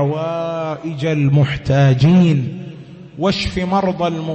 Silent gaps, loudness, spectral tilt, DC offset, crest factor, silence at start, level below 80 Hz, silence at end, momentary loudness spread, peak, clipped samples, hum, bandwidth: none; -16 LUFS; -7.5 dB/octave; under 0.1%; 14 dB; 0 s; -40 dBFS; 0 s; 15 LU; -2 dBFS; under 0.1%; none; 8.4 kHz